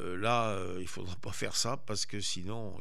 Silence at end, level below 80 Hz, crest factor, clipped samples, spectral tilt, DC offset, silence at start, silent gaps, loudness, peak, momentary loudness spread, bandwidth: 0 s; -64 dBFS; 20 dB; under 0.1%; -3.5 dB/octave; 2%; 0 s; none; -35 LUFS; -18 dBFS; 11 LU; 15 kHz